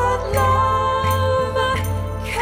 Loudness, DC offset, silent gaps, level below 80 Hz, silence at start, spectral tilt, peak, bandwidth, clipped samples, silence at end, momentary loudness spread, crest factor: -19 LUFS; under 0.1%; none; -34 dBFS; 0 s; -5 dB/octave; -6 dBFS; 16.5 kHz; under 0.1%; 0 s; 8 LU; 12 dB